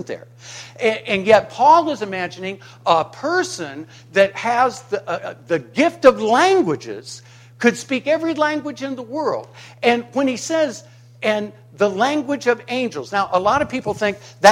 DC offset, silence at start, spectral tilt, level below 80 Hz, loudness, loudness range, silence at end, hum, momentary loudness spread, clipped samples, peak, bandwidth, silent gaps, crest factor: under 0.1%; 0 s; -4 dB/octave; -58 dBFS; -19 LUFS; 4 LU; 0 s; none; 16 LU; under 0.1%; 0 dBFS; 15 kHz; none; 18 dB